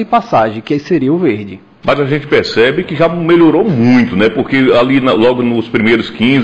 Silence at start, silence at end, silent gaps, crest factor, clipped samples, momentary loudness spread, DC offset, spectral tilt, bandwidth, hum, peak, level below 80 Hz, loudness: 0 s; 0 s; none; 10 dB; under 0.1%; 6 LU; 0.5%; -7.5 dB/octave; 8.2 kHz; none; 0 dBFS; -44 dBFS; -11 LUFS